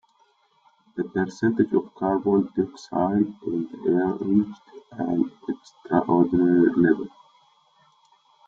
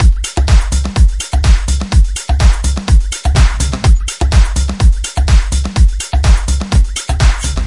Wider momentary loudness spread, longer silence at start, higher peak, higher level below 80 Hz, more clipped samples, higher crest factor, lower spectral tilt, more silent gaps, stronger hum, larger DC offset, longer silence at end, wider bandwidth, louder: first, 14 LU vs 3 LU; first, 0.95 s vs 0 s; second, -6 dBFS vs 0 dBFS; second, -62 dBFS vs -10 dBFS; neither; first, 18 dB vs 10 dB; first, -8.5 dB/octave vs -4.5 dB/octave; neither; neither; neither; first, 1.4 s vs 0 s; second, 7.4 kHz vs 11.5 kHz; second, -23 LUFS vs -13 LUFS